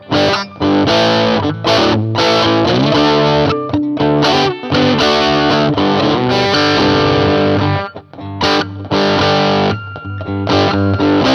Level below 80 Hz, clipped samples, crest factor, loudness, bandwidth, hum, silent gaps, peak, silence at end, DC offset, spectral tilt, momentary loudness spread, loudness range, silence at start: -40 dBFS; under 0.1%; 12 dB; -13 LUFS; 11.5 kHz; none; none; 0 dBFS; 0 s; under 0.1%; -5.5 dB/octave; 6 LU; 3 LU; 0 s